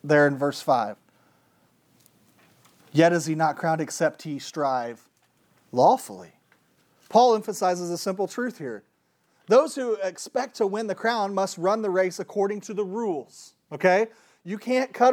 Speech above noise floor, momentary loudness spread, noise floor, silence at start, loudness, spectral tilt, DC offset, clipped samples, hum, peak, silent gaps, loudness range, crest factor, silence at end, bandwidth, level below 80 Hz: 45 dB; 14 LU; -68 dBFS; 0.05 s; -24 LUFS; -5 dB/octave; under 0.1%; under 0.1%; none; -6 dBFS; none; 2 LU; 20 dB; 0 s; 18 kHz; -84 dBFS